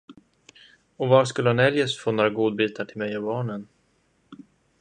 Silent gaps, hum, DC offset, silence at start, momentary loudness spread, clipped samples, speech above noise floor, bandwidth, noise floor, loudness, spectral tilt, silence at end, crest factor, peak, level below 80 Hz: none; none; under 0.1%; 0.1 s; 11 LU; under 0.1%; 43 dB; 9.8 kHz; -66 dBFS; -23 LUFS; -6 dB/octave; 0.45 s; 22 dB; -4 dBFS; -66 dBFS